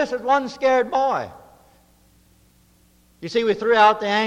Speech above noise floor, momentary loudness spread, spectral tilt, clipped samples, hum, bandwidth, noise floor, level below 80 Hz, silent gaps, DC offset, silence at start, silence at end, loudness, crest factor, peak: 37 dB; 12 LU; -4 dB/octave; under 0.1%; none; 12 kHz; -57 dBFS; -58 dBFS; none; under 0.1%; 0 s; 0 s; -19 LUFS; 18 dB; -4 dBFS